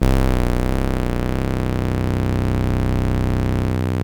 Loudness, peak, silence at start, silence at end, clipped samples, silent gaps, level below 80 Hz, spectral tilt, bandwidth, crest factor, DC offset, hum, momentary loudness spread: -21 LUFS; -2 dBFS; 0 s; 0 s; under 0.1%; none; -24 dBFS; -7.5 dB/octave; 18.5 kHz; 16 dB; under 0.1%; none; 2 LU